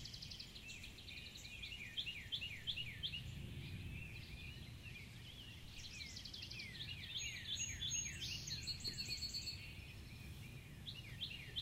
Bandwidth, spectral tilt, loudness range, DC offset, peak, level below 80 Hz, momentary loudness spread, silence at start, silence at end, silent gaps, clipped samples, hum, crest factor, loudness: 16 kHz; -1.5 dB/octave; 7 LU; under 0.1%; -32 dBFS; -60 dBFS; 11 LU; 0 s; 0 s; none; under 0.1%; none; 18 dB; -47 LUFS